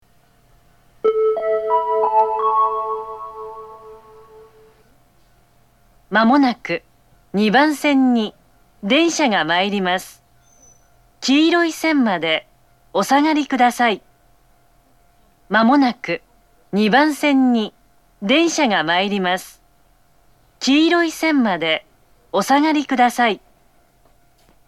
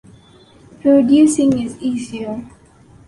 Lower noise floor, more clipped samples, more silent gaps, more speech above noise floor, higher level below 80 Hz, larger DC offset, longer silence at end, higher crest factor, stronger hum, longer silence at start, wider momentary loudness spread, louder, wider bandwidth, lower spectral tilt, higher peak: first, -56 dBFS vs -46 dBFS; neither; neither; first, 40 dB vs 32 dB; second, -60 dBFS vs -52 dBFS; first, 0.1% vs under 0.1%; first, 1.3 s vs 0.6 s; about the same, 16 dB vs 14 dB; neither; first, 1.05 s vs 0.85 s; second, 12 LU vs 15 LU; about the same, -17 LUFS vs -15 LUFS; first, 14 kHz vs 11.5 kHz; second, -4 dB/octave vs -5.5 dB/octave; about the same, -2 dBFS vs -2 dBFS